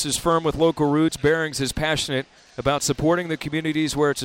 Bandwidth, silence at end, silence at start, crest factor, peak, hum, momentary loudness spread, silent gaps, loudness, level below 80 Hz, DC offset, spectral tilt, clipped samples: 16.5 kHz; 0 s; 0 s; 14 dB; -8 dBFS; none; 6 LU; none; -22 LUFS; -44 dBFS; under 0.1%; -4.5 dB/octave; under 0.1%